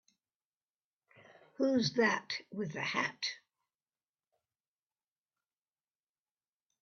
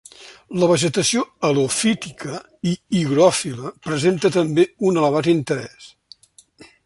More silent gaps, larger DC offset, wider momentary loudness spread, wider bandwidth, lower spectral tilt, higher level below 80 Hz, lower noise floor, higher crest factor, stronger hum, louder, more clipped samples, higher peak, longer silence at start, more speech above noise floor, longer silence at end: neither; neither; about the same, 11 LU vs 13 LU; second, 7 kHz vs 11.5 kHz; second, -2.5 dB/octave vs -4.5 dB/octave; second, -80 dBFS vs -58 dBFS; first, under -90 dBFS vs -50 dBFS; about the same, 22 dB vs 18 dB; neither; second, -34 LUFS vs -19 LUFS; neither; second, -18 dBFS vs -2 dBFS; first, 1.6 s vs 0.2 s; first, over 56 dB vs 31 dB; first, 3.45 s vs 1 s